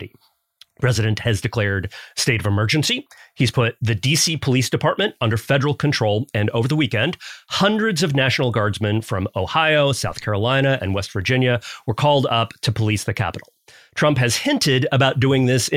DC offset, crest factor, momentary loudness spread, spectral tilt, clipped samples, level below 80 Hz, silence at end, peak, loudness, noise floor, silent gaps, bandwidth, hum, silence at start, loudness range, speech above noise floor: under 0.1%; 14 dB; 7 LU; -4.5 dB/octave; under 0.1%; -52 dBFS; 0 s; -4 dBFS; -19 LUFS; -58 dBFS; none; 16 kHz; none; 0 s; 1 LU; 39 dB